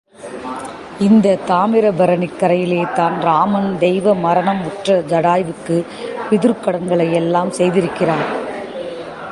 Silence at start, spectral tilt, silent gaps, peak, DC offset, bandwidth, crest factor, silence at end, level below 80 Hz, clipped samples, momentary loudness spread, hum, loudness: 0.2 s; -7 dB/octave; none; -2 dBFS; under 0.1%; 11.5 kHz; 14 dB; 0 s; -54 dBFS; under 0.1%; 13 LU; none; -16 LUFS